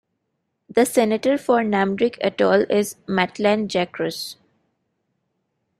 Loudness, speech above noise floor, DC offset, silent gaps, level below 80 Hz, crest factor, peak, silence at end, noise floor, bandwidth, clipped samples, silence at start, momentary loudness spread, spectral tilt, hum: -20 LUFS; 55 dB; under 0.1%; none; -64 dBFS; 18 dB; -4 dBFS; 1.45 s; -75 dBFS; 15.5 kHz; under 0.1%; 0.75 s; 7 LU; -5 dB/octave; none